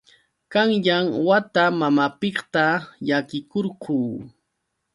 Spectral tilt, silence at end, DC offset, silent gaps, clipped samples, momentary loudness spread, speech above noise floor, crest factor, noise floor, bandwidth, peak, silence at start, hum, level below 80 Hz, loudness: -6.5 dB/octave; 0.65 s; under 0.1%; none; under 0.1%; 8 LU; 55 dB; 18 dB; -77 dBFS; 11.5 kHz; -4 dBFS; 0.5 s; none; -66 dBFS; -21 LUFS